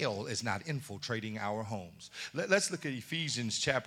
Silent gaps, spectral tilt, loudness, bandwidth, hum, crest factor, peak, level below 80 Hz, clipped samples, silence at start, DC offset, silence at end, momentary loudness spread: none; -3.5 dB/octave; -35 LUFS; 17.5 kHz; none; 24 dB; -12 dBFS; -72 dBFS; under 0.1%; 0 s; under 0.1%; 0 s; 11 LU